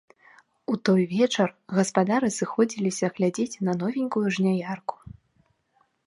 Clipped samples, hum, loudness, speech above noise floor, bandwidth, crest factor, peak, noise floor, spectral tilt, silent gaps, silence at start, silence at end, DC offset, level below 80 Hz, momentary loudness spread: under 0.1%; none; -25 LUFS; 44 dB; 11.5 kHz; 20 dB; -6 dBFS; -68 dBFS; -5.5 dB/octave; none; 0.7 s; 0.95 s; under 0.1%; -66 dBFS; 7 LU